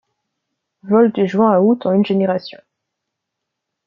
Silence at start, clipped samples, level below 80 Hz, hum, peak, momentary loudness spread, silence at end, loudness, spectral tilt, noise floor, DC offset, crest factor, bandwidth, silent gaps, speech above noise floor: 0.85 s; under 0.1%; -64 dBFS; none; -2 dBFS; 8 LU; 1.35 s; -15 LUFS; -9 dB/octave; -79 dBFS; under 0.1%; 16 dB; 6.6 kHz; none; 64 dB